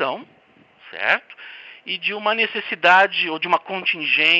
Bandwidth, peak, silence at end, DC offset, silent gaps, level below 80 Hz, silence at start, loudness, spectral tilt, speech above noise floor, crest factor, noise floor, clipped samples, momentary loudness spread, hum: 8 kHz; -4 dBFS; 0 s; under 0.1%; none; -76 dBFS; 0 s; -19 LUFS; -3.5 dB/octave; 34 dB; 18 dB; -54 dBFS; under 0.1%; 22 LU; none